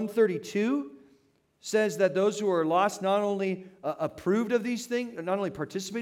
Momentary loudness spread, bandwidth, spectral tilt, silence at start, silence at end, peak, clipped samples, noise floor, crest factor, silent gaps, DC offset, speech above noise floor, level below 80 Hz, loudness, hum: 8 LU; 16 kHz; -5 dB/octave; 0 s; 0 s; -12 dBFS; under 0.1%; -66 dBFS; 16 dB; none; under 0.1%; 39 dB; -72 dBFS; -28 LUFS; none